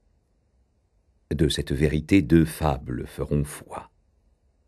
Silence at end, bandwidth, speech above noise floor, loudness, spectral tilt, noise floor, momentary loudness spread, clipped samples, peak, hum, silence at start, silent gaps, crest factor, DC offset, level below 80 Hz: 0.85 s; 13 kHz; 43 dB; -24 LUFS; -6.5 dB/octave; -66 dBFS; 15 LU; under 0.1%; -6 dBFS; none; 1.3 s; none; 20 dB; under 0.1%; -38 dBFS